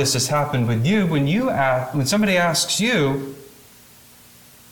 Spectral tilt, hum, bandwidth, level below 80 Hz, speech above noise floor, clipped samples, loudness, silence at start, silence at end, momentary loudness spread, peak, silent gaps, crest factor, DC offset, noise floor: -4.5 dB/octave; none; 19 kHz; -52 dBFS; 28 dB; under 0.1%; -19 LUFS; 0 s; 1.25 s; 4 LU; -8 dBFS; none; 14 dB; under 0.1%; -48 dBFS